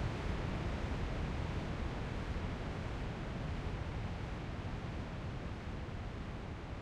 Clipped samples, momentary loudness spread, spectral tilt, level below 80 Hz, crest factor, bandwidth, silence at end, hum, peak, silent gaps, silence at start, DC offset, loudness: under 0.1%; 5 LU; -7 dB/octave; -44 dBFS; 14 dB; 11 kHz; 0 s; none; -26 dBFS; none; 0 s; under 0.1%; -42 LUFS